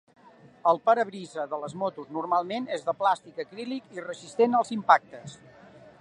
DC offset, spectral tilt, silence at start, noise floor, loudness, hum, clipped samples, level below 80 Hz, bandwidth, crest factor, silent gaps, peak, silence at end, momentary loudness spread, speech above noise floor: under 0.1%; -5 dB/octave; 0.65 s; -51 dBFS; -27 LUFS; none; under 0.1%; -76 dBFS; 10.5 kHz; 24 dB; none; -4 dBFS; 0.1 s; 16 LU; 24 dB